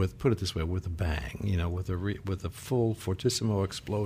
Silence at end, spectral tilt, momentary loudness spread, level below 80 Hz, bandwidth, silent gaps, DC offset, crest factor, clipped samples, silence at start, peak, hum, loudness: 0 s; -6 dB/octave; 5 LU; -46 dBFS; 15.5 kHz; none; under 0.1%; 16 dB; under 0.1%; 0 s; -14 dBFS; none; -31 LUFS